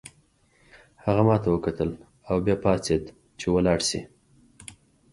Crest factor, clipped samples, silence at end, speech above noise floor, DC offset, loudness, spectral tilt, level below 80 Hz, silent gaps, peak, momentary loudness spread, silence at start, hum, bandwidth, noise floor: 22 dB; under 0.1%; 0.4 s; 39 dB; under 0.1%; -25 LUFS; -5.5 dB/octave; -46 dBFS; none; -6 dBFS; 23 LU; 0.05 s; none; 11.5 kHz; -62 dBFS